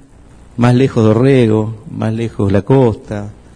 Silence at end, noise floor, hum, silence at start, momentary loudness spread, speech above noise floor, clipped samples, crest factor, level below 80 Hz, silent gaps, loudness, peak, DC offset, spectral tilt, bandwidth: 0.25 s; -40 dBFS; none; 0.55 s; 13 LU; 28 dB; 0.2%; 14 dB; -40 dBFS; none; -13 LUFS; 0 dBFS; under 0.1%; -8.5 dB/octave; 10 kHz